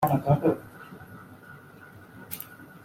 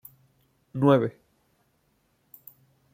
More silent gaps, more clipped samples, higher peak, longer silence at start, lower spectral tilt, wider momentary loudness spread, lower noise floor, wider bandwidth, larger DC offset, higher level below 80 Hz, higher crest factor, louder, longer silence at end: neither; neither; second, -10 dBFS vs -6 dBFS; second, 0 s vs 0.75 s; about the same, -8 dB/octave vs -8.5 dB/octave; second, 24 LU vs 27 LU; second, -49 dBFS vs -70 dBFS; about the same, 16 kHz vs 16.5 kHz; neither; first, -58 dBFS vs -70 dBFS; about the same, 20 dB vs 24 dB; second, -27 LUFS vs -23 LUFS; second, 0.05 s vs 1.85 s